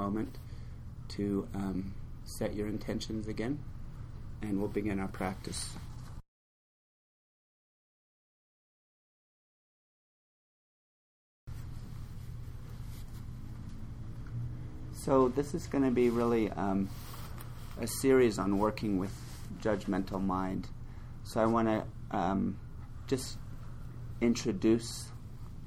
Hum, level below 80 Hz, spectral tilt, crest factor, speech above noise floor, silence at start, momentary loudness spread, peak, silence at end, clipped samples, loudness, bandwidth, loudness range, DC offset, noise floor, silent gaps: none; -48 dBFS; -6 dB/octave; 20 dB; over 58 dB; 0 s; 19 LU; -14 dBFS; 0 s; under 0.1%; -33 LUFS; 17.5 kHz; 16 LU; under 0.1%; under -90 dBFS; 6.28-11.47 s